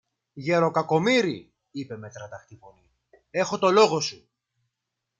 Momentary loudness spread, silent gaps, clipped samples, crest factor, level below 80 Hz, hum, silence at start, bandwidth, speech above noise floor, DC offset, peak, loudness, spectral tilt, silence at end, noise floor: 21 LU; none; under 0.1%; 22 dB; -70 dBFS; none; 0.35 s; 9.2 kHz; 59 dB; under 0.1%; -6 dBFS; -23 LUFS; -4.5 dB/octave; 1.05 s; -83 dBFS